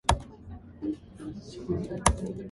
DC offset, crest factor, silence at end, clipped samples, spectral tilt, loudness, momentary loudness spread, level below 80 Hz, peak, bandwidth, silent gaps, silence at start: under 0.1%; 28 dB; 0 s; under 0.1%; -4.5 dB/octave; -32 LUFS; 18 LU; -38 dBFS; -4 dBFS; 12 kHz; none; 0.05 s